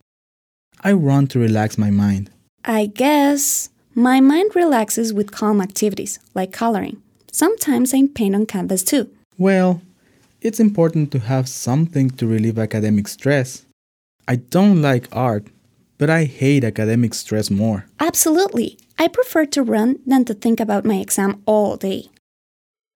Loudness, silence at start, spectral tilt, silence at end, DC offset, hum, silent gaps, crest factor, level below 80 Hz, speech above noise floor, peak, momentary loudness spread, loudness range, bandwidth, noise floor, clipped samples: -18 LUFS; 0.85 s; -5.5 dB/octave; 0.95 s; under 0.1%; none; 2.49-2.58 s, 9.25-9.31 s, 13.73-14.19 s; 16 dB; -62 dBFS; 39 dB; -2 dBFS; 10 LU; 3 LU; over 20 kHz; -56 dBFS; under 0.1%